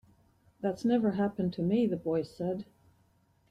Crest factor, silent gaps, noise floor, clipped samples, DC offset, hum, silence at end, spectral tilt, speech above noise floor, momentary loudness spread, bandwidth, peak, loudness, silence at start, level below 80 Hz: 16 dB; none; -68 dBFS; under 0.1%; under 0.1%; none; 0.85 s; -8.5 dB/octave; 38 dB; 8 LU; 10.5 kHz; -16 dBFS; -31 LUFS; 0.6 s; -66 dBFS